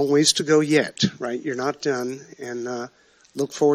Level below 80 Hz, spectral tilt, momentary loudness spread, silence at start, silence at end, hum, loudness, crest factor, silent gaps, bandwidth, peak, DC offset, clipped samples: -70 dBFS; -4 dB/octave; 16 LU; 0 s; 0 s; none; -22 LUFS; 20 dB; none; 14 kHz; -2 dBFS; under 0.1%; under 0.1%